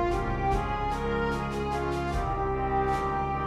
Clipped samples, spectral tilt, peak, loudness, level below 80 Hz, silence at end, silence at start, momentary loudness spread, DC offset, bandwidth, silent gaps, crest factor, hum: under 0.1%; -7 dB/octave; -16 dBFS; -29 LUFS; -36 dBFS; 0 s; 0 s; 3 LU; under 0.1%; 14 kHz; none; 12 dB; none